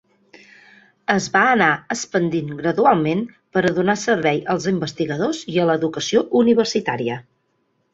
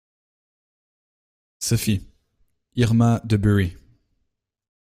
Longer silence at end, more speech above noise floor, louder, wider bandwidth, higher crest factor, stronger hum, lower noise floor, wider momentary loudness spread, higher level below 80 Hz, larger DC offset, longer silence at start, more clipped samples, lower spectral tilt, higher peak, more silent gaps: second, 0.75 s vs 1.15 s; second, 49 dB vs 56 dB; about the same, -19 LUFS vs -21 LUFS; second, 8 kHz vs 16 kHz; about the same, 18 dB vs 20 dB; neither; second, -67 dBFS vs -75 dBFS; about the same, 8 LU vs 10 LU; second, -58 dBFS vs -46 dBFS; neither; second, 1.1 s vs 1.6 s; neither; about the same, -5 dB/octave vs -6 dB/octave; first, -2 dBFS vs -6 dBFS; neither